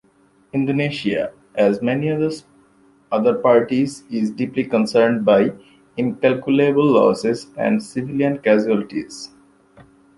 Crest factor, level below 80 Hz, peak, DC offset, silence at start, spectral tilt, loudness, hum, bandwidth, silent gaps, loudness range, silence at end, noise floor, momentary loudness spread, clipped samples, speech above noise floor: 16 dB; -60 dBFS; -2 dBFS; under 0.1%; 0.55 s; -6.5 dB/octave; -19 LUFS; none; 11.5 kHz; none; 3 LU; 0.9 s; -56 dBFS; 11 LU; under 0.1%; 38 dB